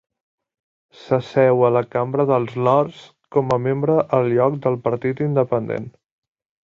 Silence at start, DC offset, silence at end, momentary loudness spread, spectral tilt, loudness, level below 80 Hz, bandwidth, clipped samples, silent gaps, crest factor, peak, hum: 1 s; under 0.1%; 0.75 s; 6 LU; -9 dB/octave; -19 LUFS; -60 dBFS; 7.4 kHz; under 0.1%; none; 16 dB; -4 dBFS; none